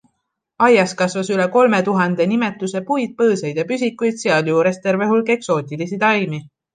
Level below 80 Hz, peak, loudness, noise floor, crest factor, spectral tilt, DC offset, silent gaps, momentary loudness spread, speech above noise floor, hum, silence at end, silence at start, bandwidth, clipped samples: -66 dBFS; -2 dBFS; -17 LUFS; -74 dBFS; 16 dB; -5.5 dB/octave; under 0.1%; none; 7 LU; 57 dB; none; 0.3 s; 0.6 s; 9.6 kHz; under 0.1%